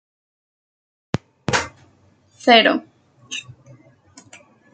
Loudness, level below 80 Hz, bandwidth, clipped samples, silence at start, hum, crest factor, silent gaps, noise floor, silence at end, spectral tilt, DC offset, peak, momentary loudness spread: -19 LUFS; -58 dBFS; 9.4 kHz; under 0.1%; 1.15 s; none; 22 dB; none; -56 dBFS; 1.35 s; -3.5 dB/octave; under 0.1%; 0 dBFS; 19 LU